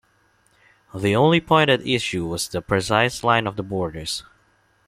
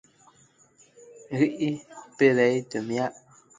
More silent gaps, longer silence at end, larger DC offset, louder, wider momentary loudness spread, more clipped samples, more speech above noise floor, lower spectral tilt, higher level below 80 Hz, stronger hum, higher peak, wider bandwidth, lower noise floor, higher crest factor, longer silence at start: neither; first, 0.65 s vs 0.45 s; neither; first, -21 LUFS vs -25 LUFS; second, 11 LU vs 14 LU; neither; first, 41 dB vs 36 dB; second, -4.5 dB/octave vs -6 dB/octave; first, -50 dBFS vs -72 dBFS; neither; first, -2 dBFS vs -8 dBFS; first, 15.5 kHz vs 9.4 kHz; about the same, -62 dBFS vs -60 dBFS; about the same, 20 dB vs 20 dB; second, 0.95 s vs 1.2 s